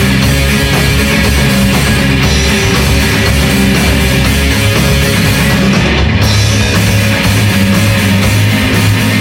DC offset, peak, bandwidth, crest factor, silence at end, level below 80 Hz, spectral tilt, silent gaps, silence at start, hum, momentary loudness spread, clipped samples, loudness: under 0.1%; 0 dBFS; 17 kHz; 8 dB; 0 s; -18 dBFS; -4.5 dB/octave; none; 0 s; none; 1 LU; under 0.1%; -9 LUFS